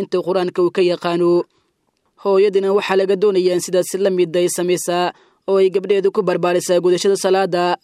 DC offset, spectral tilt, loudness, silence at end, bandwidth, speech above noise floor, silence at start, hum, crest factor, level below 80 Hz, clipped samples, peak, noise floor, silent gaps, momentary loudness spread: under 0.1%; -5 dB/octave; -17 LUFS; 0.1 s; 15 kHz; 50 dB; 0 s; none; 14 dB; -70 dBFS; under 0.1%; -2 dBFS; -66 dBFS; none; 4 LU